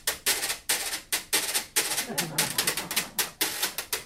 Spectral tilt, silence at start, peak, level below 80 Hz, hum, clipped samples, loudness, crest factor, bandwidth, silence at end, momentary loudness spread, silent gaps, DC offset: 0 dB/octave; 0.05 s; -8 dBFS; -58 dBFS; none; under 0.1%; -27 LUFS; 22 dB; 16.5 kHz; 0 s; 3 LU; none; under 0.1%